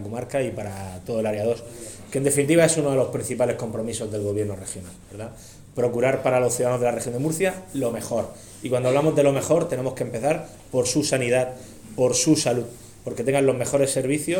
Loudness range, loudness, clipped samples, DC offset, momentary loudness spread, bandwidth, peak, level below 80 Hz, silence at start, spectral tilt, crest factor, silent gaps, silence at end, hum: 3 LU; -23 LUFS; under 0.1%; under 0.1%; 16 LU; 18 kHz; -4 dBFS; -54 dBFS; 0 s; -4.5 dB/octave; 18 dB; none; 0 s; none